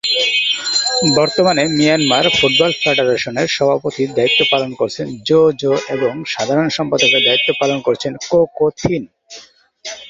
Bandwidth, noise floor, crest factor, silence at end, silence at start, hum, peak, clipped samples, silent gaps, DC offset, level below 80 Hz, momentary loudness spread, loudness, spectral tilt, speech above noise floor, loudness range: 8 kHz; -42 dBFS; 14 dB; 0 s; 0.05 s; none; 0 dBFS; under 0.1%; none; under 0.1%; -50 dBFS; 9 LU; -14 LUFS; -3.5 dB/octave; 27 dB; 2 LU